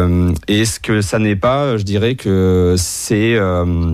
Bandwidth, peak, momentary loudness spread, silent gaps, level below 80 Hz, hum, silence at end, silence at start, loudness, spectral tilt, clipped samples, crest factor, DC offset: 15.5 kHz; -4 dBFS; 3 LU; none; -32 dBFS; none; 0 s; 0 s; -15 LUFS; -5.5 dB/octave; under 0.1%; 10 dB; under 0.1%